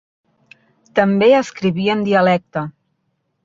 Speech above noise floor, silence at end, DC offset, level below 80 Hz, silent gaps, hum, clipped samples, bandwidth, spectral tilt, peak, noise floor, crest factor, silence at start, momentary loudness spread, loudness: 54 dB; 0.75 s; under 0.1%; -60 dBFS; none; none; under 0.1%; 7.6 kHz; -6.5 dB/octave; -2 dBFS; -69 dBFS; 16 dB; 0.95 s; 13 LU; -16 LUFS